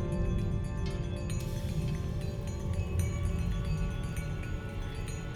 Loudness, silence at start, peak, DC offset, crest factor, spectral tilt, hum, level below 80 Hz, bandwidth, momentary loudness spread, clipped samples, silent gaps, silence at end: -35 LUFS; 0 s; -18 dBFS; under 0.1%; 16 dB; -6.5 dB/octave; none; -38 dBFS; 16 kHz; 6 LU; under 0.1%; none; 0 s